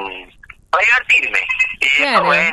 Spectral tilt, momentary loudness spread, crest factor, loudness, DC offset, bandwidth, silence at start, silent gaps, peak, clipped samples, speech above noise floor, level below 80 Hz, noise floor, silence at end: -2 dB/octave; 9 LU; 16 dB; -13 LUFS; under 0.1%; 13 kHz; 0 s; none; 0 dBFS; under 0.1%; 28 dB; -48 dBFS; -42 dBFS; 0 s